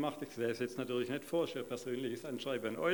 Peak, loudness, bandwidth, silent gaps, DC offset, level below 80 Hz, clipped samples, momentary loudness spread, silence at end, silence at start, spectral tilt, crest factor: -20 dBFS; -39 LUFS; 19.5 kHz; none; under 0.1%; -82 dBFS; under 0.1%; 4 LU; 0 s; 0 s; -5 dB/octave; 18 dB